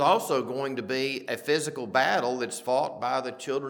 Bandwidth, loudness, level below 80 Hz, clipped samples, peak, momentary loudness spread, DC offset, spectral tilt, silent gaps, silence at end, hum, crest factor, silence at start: 19 kHz; -28 LUFS; -82 dBFS; under 0.1%; -8 dBFS; 7 LU; under 0.1%; -3.5 dB/octave; none; 0 s; none; 20 dB; 0 s